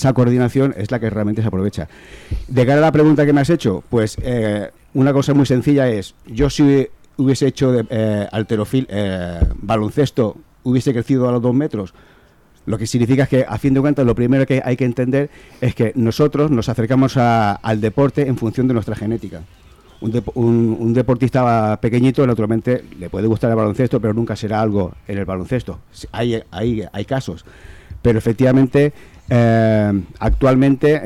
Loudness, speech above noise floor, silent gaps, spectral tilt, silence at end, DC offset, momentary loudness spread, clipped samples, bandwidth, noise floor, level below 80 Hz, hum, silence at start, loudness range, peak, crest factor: -17 LUFS; 34 dB; none; -7.5 dB/octave; 0 s; under 0.1%; 10 LU; under 0.1%; 13.5 kHz; -50 dBFS; -34 dBFS; none; 0 s; 4 LU; -6 dBFS; 10 dB